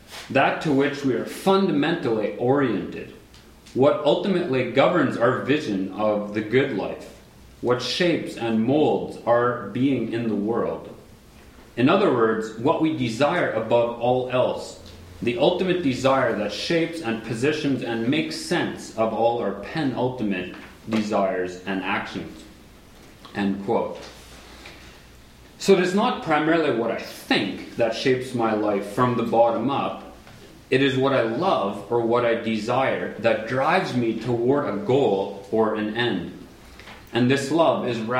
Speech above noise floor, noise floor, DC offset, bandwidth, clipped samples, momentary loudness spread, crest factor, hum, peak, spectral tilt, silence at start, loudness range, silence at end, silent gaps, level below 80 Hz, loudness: 26 dB; -48 dBFS; under 0.1%; 16 kHz; under 0.1%; 11 LU; 18 dB; none; -4 dBFS; -6 dB/octave; 0.1 s; 4 LU; 0 s; none; -56 dBFS; -23 LUFS